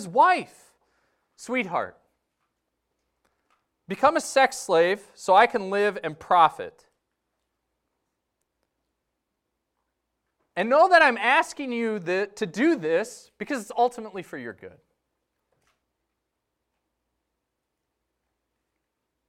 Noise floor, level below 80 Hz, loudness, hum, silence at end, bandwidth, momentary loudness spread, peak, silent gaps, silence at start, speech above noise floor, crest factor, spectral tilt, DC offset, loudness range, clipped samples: -81 dBFS; -70 dBFS; -22 LUFS; none; 4.6 s; 15.5 kHz; 19 LU; -4 dBFS; none; 0 s; 58 dB; 22 dB; -3.5 dB/octave; under 0.1%; 11 LU; under 0.1%